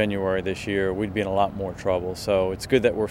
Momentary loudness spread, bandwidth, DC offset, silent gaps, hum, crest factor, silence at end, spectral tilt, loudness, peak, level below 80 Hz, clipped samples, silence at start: 5 LU; 16.5 kHz; under 0.1%; none; none; 18 dB; 0 s; -6 dB/octave; -24 LUFS; -6 dBFS; -46 dBFS; under 0.1%; 0 s